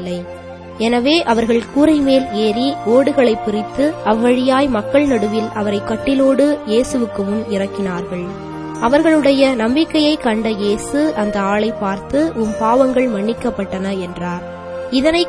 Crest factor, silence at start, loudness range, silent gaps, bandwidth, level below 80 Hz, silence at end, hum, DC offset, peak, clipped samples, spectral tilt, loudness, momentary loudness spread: 16 dB; 0 s; 3 LU; none; 11 kHz; -42 dBFS; 0 s; none; under 0.1%; 0 dBFS; under 0.1%; -5.5 dB/octave; -16 LUFS; 11 LU